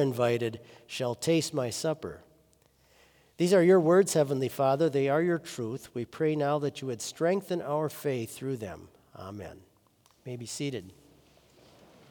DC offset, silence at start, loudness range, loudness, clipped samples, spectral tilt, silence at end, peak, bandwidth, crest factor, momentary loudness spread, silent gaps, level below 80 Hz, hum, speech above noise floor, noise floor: under 0.1%; 0 s; 14 LU; -28 LUFS; under 0.1%; -5.5 dB/octave; 1.2 s; -12 dBFS; over 20 kHz; 18 dB; 19 LU; none; -70 dBFS; none; 37 dB; -65 dBFS